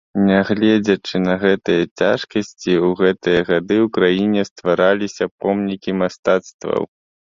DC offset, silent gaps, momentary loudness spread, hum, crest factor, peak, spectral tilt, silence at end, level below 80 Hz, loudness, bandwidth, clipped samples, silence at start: under 0.1%; 1.91-1.96 s, 4.51-4.56 s, 5.31-5.38 s, 6.19-6.23 s, 6.54-6.59 s; 7 LU; none; 16 dB; 0 dBFS; -6 dB/octave; 0.5 s; -52 dBFS; -18 LUFS; 7.4 kHz; under 0.1%; 0.15 s